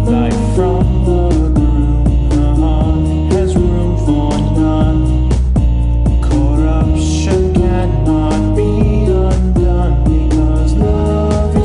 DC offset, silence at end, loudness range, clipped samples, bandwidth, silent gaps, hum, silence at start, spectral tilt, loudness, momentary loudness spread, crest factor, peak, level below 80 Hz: under 0.1%; 0 s; 0 LU; under 0.1%; 10.5 kHz; none; none; 0 s; -8 dB/octave; -13 LUFS; 1 LU; 10 dB; 0 dBFS; -14 dBFS